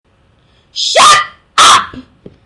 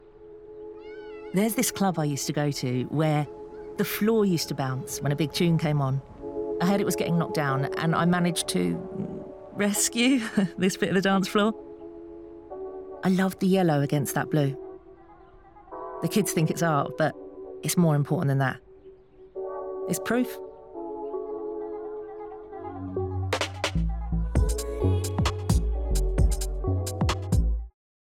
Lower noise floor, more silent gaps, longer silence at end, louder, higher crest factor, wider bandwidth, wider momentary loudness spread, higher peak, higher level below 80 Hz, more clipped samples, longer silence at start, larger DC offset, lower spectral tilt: about the same, -51 dBFS vs -51 dBFS; neither; about the same, 0.45 s vs 0.35 s; first, -7 LUFS vs -26 LUFS; about the same, 12 dB vs 14 dB; second, 12 kHz vs 18.5 kHz; about the same, 16 LU vs 17 LU; first, 0 dBFS vs -12 dBFS; second, -48 dBFS vs -36 dBFS; first, 0.6% vs under 0.1%; first, 0.75 s vs 0.05 s; neither; second, 0.5 dB/octave vs -5.5 dB/octave